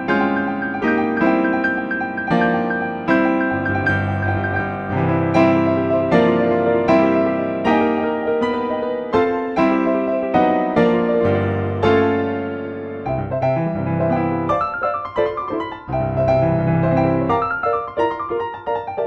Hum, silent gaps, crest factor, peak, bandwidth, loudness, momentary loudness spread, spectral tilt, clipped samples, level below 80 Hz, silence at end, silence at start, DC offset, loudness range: none; none; 16 dB; -2 dBFS; 7 kHz; -19 LUFS; 7 LU; -8.5 dB/octave; under 0.1%; -46 dBFS; 0 s; 0 s; under 0.1%; 3 LU